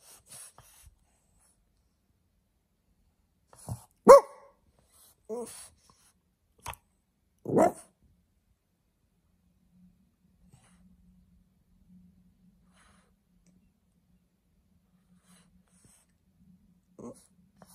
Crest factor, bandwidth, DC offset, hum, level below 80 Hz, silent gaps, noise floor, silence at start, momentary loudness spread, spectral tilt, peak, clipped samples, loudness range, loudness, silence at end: 30 dB; 14.5 kHz; under 0.1%; none; -66 dBFS; none; -75 dBFS; 3.7 s; 32 LU; -5.5 dB/octave; -2 dBFS; under 0.1%; 9 LU; -22 LUFS; 10.05 s